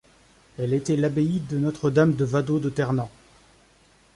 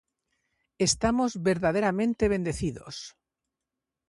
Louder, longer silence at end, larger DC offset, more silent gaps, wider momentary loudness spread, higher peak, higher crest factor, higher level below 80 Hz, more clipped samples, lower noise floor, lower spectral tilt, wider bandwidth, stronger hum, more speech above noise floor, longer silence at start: about the same, -24 LUFS vs -26 LUFS; about the same, 1.1 s vs 1 s; neither; neither; second, 7 LU vs 15 LU; first, -8 dBFS vs -12 dBFS; about the same, 18 dB vs 18 dB; second, -56 dBFS vs -48 dBFS; neither; second, -58 dBFS vs -87 dBFS; first, -7.5 dB/octave vs -4.5 dB/octave; about the same, 11.5 kHz vs 11.5 kHz; neither; second, 35 dB vs 61 dB; second, 0.6 s vs 0.8 s